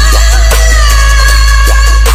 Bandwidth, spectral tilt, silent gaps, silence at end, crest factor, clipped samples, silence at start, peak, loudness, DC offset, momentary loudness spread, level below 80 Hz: 15.5 kHz; -2.5 dB/octave; none; 0 s; 4 dB; 2%; 0 s; 0 dBFS; -7 LUFS; under 0.1%; 1 LU; -6 dBFS